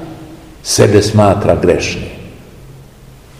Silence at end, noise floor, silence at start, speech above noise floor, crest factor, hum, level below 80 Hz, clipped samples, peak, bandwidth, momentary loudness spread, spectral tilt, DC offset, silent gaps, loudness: 0.7 s; -38 dBFS; 0 s; 27 dB; 14 dB; none; -36 dBFS; 0.7%; 0 dBFS; 15.5 kHz; 22 LU; -5 dB/octave; 0.2%; none; -11 LUFS